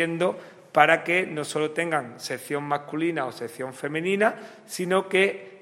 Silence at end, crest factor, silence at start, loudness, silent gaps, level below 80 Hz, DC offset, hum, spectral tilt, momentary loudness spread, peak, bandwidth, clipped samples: 0.05 s; 22 dB; 0 s; -25 LUFS; none; -78 dBFS; under 0.1%; none; -4.5 dB/octave; 13 LU; -2 dBFS; 16 kHz; under 0.1%